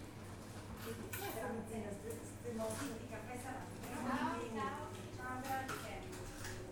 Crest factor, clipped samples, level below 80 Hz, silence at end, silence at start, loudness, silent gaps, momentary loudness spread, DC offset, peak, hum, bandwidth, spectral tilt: 18 dB; under 0.1%; -60 dBFS; 0 s; 0 s; -45 LUFS; none; 8 LU; under 0.1%; -26 dBFS; none; 19 kHz; -4.5 dB/octave